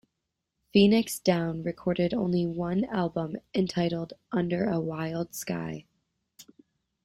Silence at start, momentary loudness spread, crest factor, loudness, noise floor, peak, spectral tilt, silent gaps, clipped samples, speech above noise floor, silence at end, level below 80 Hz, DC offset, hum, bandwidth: 0.75 s; 11 LU; 20 dB; -28 LUFS; -83 dBFS; -8 dBFS; -6 dB/octave; none; under 0.1%; 56 dB; 0.6 s; -60 dBFS; under 0.1%; none; 16 kHz